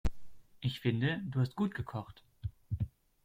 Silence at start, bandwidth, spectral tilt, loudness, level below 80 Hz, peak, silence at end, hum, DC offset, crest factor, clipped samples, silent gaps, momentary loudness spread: 0.05 s; 15.5 kHz; -7.5 dB/octave; -37 LUFS; -48 dBFS; -18 dBFS; 0.35 s; none; under 0.1%; 18 dB; under 0.1%; none; 13 LU